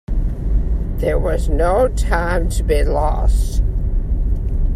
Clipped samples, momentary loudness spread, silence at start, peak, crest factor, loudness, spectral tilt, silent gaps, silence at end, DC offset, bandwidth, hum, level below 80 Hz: under 0.1%; 5 LU; 0.1 s; -2 dBFS; 14 dB; -19 LUFS; -6.5 dB/octave; none; 0 s; under 0.1%; 14 kHz; none; -16 dBFS